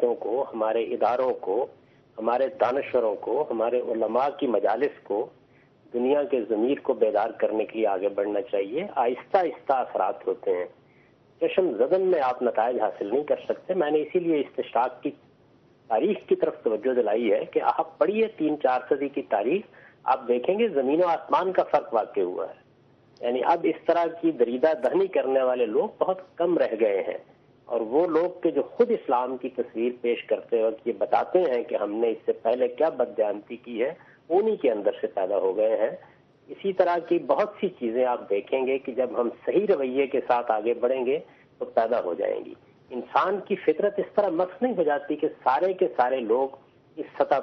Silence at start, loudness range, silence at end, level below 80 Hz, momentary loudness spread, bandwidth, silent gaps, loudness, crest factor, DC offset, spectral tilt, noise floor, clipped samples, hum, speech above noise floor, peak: 0 s; 2 LU; 0 s; -74 dBFS; 6 LU; 6 kHz; none; -26 LUFS; 18 dB; under 0.1%; -4 dB/octave; -58 dBFS; under 0.1%; none; 33 dB; -6 dBFS